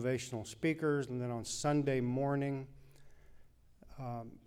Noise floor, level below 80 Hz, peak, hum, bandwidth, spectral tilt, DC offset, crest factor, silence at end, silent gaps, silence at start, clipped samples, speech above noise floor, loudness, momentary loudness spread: -60 dBFS; -62 dBFS; -22 dBFS; none; 15.5 kHz; -6 dB/octave; under 0.1%; 16 dB; 0.05 s; none; 0 s; under 0.1%; 24 dB; -36 LUFS; 11 LU